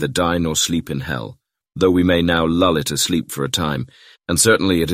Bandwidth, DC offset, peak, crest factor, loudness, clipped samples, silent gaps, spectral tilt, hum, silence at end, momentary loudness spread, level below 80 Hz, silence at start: 16 kHz; under 0.1%; -2 dBFS; 16 dB; -18 LUFS; under 0.1%; none; -4 dB/octave; none; 0 s; 13 LU; -40 dBFS; 0 s